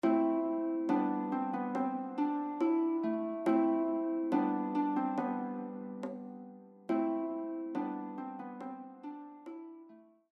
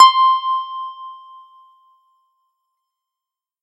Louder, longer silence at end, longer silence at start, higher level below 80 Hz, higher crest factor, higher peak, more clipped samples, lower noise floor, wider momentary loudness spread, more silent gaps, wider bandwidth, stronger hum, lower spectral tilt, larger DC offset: second, -34 LUFS vs -16 LUFS; second, 0.3 s vs 2.5 s; about the same, 0.05 s vs 0 s; about the same, -86 dBFS vs -86 dBFS; about the same, 16 dB vs 20 dB; second, -18 dBFS vs 0 dBFS; neither; second, -58 dBFS vs -87 dBFS; second, 17 LU vs 24 LU; neither; second, 5.8 kHz vs 10 kHz; neither; first, -8.5 dB/octave vs 6 dB/octave; neither